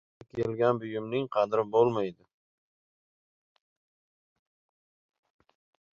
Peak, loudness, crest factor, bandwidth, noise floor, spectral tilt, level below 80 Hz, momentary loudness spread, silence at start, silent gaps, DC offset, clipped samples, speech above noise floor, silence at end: -10 dBFS; -29 LUFS; 22 dB; 7 kHz; under -90 dBFS; -8 dB/octave; -70 dBFS; 9 LU; 0.35 s; none; under 0.1%; under 0.1%; over 62 dB; 3.8 s